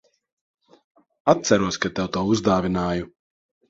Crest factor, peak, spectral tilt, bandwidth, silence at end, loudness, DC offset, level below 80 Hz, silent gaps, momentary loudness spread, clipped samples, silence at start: 24 dB; 0 dBFS; -5 dB/octave; 7.8 kHz; 0.65 s; -22 LUFS; under 0.1%; -48 dBFS; none; 8 LU; under 0.1%; 1.25 s